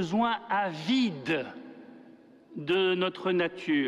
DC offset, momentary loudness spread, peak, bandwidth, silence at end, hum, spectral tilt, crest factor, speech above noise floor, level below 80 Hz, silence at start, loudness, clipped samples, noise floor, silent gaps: under 0.1%; 19 LU; -16 dBFS; 10.5 kHz; 0 s; none; -6 dB/octave; 14 dB; 26 dB; -70 dBFS; 0 s; -29 LUFS; under 0.1%; -54 dBFS; none